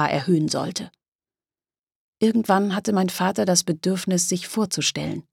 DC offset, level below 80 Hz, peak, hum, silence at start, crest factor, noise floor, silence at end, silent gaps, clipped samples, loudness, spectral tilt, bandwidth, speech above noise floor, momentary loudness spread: under 0.1%; -62 dBFS; -4 dBFS; none; 0 s; 20 dB; under -90 dBFS; 0.1 s; 1.08-1.19 s, 1.79-1.87 s, 1.95-2.13 s; under 0.1%; -22 LUFS; -4 dB/octave; 17.5 kHz; over 68 dB; 7 LU